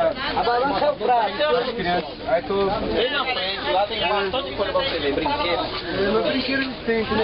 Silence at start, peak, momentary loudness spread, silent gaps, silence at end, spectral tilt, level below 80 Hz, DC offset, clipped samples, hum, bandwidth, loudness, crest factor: 0 s; -10 dBFS; 4 LU; none; 0 s; -9 dB/octave; -44 dBFS; under 0.1%; under 0.1%; none; 5.8 kHz; -22 LUFS; 12 dB